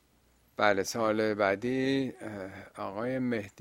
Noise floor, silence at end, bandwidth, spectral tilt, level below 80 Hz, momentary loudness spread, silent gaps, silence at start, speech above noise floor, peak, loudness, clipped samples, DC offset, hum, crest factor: -66 dBFS; 0 s; 16 kHz; -5 dB/octave; -68 dBFS; 13 LU; none; 0.6 s; 36 dB; -8 dBFS; -30 LUFS; under 0.1%; under 0.1%; none; 22 dB